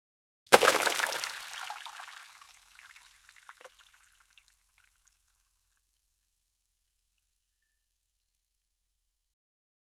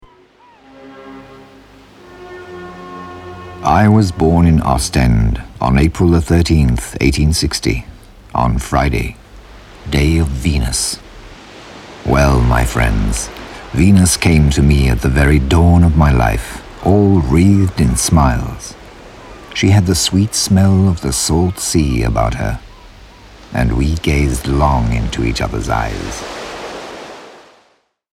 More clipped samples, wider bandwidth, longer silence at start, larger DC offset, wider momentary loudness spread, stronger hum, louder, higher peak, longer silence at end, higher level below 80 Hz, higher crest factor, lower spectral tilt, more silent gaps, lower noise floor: neither; about the same, 16 kHz vs 15.5 kHz; second, 0.5 s vs 0.8 s; neither; first, 24 LU vs 20 LU; neither; second, -27 LUFS vs -14 LUFS; about the same, 0 dBFS vs 0 dBFS; first, 6.3 s vs 0.85 s; second, -74 dBFS vs -22 dBFS; first, 36 dB vs 14 dB; second, -0.5 dB/octave vs -5.5 dB/octave; neither; first, -82 dBFS vs -57 dBFS